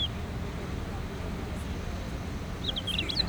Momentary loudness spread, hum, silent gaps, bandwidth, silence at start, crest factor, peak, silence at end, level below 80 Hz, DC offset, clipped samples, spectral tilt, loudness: 7 LU; none; none; over 20 kHz; 0 s; 18 dB; -14 dBFS; 0 s; -40 dBFS; under 0.1%; under 0.1%; -5 dB/octave; -34 LUFS